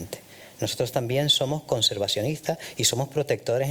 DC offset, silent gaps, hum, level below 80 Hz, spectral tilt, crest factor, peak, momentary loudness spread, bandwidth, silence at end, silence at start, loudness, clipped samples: under 0.1%; none; none; -60 dBFS; -3.5 dB/octave; 18 dB; -8 dBFS; 10 LU; over 20 kHz; 0 s; 0 s; -25 LUFS; under 0.1%